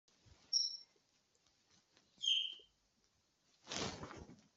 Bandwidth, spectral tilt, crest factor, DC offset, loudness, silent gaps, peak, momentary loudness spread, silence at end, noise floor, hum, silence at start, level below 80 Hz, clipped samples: 8.2 kHz; -1 dB/octave; 26 dB; under 0.1%; -38 LUFS; none; -20 dBFS; 19 LU; 0.2 s; -79 dBFS; none; 0.25 s; -74 dBFS; under 0.1%